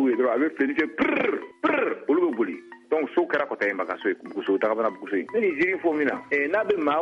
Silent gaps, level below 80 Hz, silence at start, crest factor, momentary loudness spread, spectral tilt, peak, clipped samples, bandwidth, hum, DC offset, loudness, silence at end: none; -66 dBFS; 0 s; 14 dB; 5 LU; -6.5 dB/octave; -10 dBFS; under 0.1%; 7 kHz; none; under 0.1%; -25 LUFS; 0 s